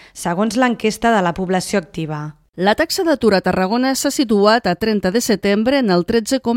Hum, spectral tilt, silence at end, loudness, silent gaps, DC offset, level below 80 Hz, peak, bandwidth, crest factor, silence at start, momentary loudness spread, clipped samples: none; -4.5 dB/octave; 0 s; -17 LUFS; 2.49-2.53 s; under 0.1%; -46 dBFS; 0 dBFS; 16.5 kHz; 16 dB; 0.15 s; 7 LU; under 0.1%